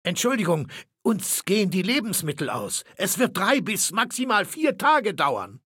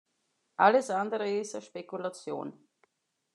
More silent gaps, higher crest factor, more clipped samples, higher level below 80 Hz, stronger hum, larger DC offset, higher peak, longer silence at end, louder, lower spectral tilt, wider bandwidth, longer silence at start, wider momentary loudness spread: neither; about the same, 18 dB vs 22 dB; neither; first, -68 dBFS vs under -90 dBFS; neither; neither; about the same, -6 dBFS vs -8 dBFS; second, 0.1 s vs 0.85 s; first, -23 LUFS vs -30 LUFS; about the same, -3.5 dB/octave vs -4.5 dB/octave; first, 17 kHz vs 11 kHz; second, 0.05 s vs 0.6 s; second, 7 LU vs 17 LU